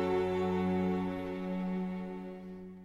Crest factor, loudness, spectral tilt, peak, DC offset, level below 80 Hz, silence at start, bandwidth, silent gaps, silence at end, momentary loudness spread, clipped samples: 14 dB; -35 LUFS; -8.5 dB/octave; -20 dBFS; under 0.1%; -60 dBFS; 0 s; 7.4 kHz; none; 0 s; 13 LU; under 0.1%